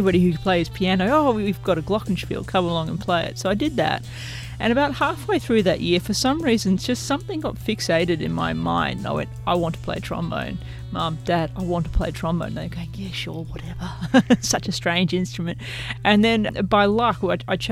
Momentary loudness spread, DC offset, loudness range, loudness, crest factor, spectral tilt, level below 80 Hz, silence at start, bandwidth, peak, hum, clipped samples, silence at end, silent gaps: 11 LU; under 0.1%; 5 LU; -22 LUFS; 20 dB; -5.5 dB/octave; -38 dBFS; 0 s; 16 kHz; -2 dBFS; none; under 0.1%; 0 s; none